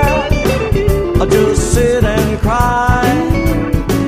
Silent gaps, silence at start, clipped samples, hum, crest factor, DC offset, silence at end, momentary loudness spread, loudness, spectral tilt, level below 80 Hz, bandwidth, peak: none; 0 s; under 0.1%; none; 12 dB; under 0.1%; 0 s; 3 LU; -13 LUFS; -6 dB/octave; -20 dBFS; 15.5 kHz; 0 dBFS